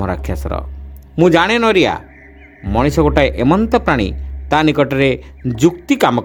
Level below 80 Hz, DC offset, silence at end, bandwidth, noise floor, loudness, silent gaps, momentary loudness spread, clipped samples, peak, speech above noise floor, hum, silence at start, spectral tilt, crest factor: -28 dBFS; under 0.1%; 0 s; 19 kHz; -40 dBFS; -15 LUFS; none; 14 LU; under 0.1%; 0 dBFS; 26 dB; none; 0 s; -6 dB/octave; 14 dB